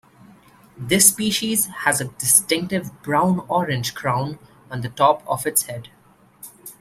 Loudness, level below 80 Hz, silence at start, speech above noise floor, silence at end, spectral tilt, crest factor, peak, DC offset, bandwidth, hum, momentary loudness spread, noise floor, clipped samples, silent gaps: -19 LUFS; -58 dBFS; 0.75 s; 33 dB; 0.1 s; -3 dB/octave; 22 dB; 0 dBFS; under 0.1%; 16 kHz; none; 19 LU; -54 dBFS; under 0.1%; none